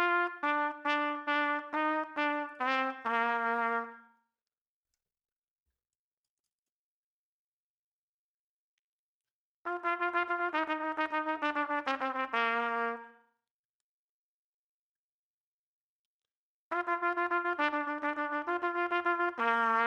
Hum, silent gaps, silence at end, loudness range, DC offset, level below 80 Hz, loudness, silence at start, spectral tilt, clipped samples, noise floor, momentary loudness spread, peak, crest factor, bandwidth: none; 4.58-4.83 s, 5.32-5.42 s, 5.48-5.66 s, 5.95-6.44 s, 6.52-9.21 s, 9.31-9.65 s, 13.51-16.20 s, 16.31-16.71 s; 0 s; 10 LU; under 0.1%; -88 dBFS; -32 LUFS; 0 s; -3.5 dB/octave; under 0.1%; under -90 dBFS; 4 LU; -16 dBFS; 20 dB; 10 kHz